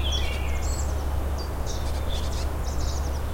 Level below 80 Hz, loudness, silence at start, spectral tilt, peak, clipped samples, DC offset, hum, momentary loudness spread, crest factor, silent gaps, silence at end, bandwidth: -28 dBFS; -29 LUFS; 0 s; -4.5 dB/octave; -14 dBFS; under 0.1%; under 0.1%; none; 3 LU; 12 dB; none; 0 s; 16.5 kHz